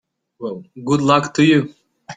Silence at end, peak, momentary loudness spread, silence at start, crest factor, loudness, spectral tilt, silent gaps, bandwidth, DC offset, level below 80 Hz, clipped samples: 0 s; -2 dBFS; 16 LU; 0.4 s; 18 dB; -16 LUFS; -6 dB/octave; none; 9.4 kHz; under 0.1%; -58 dBFS; under 0.1%